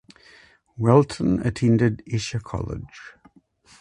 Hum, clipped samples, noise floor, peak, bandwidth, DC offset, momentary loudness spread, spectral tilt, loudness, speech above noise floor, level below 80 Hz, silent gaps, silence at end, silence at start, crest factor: none; under 0.1%; -56 dBFS; -2 dBFS; 11 kHz; under 0.1%; 16 LU; -7 dB/octave; -22 LUFS; 35 dB; -46 dBFS; none; 0.7 s; 0.8 s; 22 dB